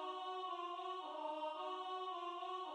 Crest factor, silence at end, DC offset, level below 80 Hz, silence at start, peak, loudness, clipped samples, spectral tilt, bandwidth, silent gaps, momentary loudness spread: 12 dB; 0 s; under 0.1%; under -90 dBFS; 0 s; -34 dBFS; -45 LUFS; under 0.1%; -1 dB/octave; 11 kHz; none; 1 LU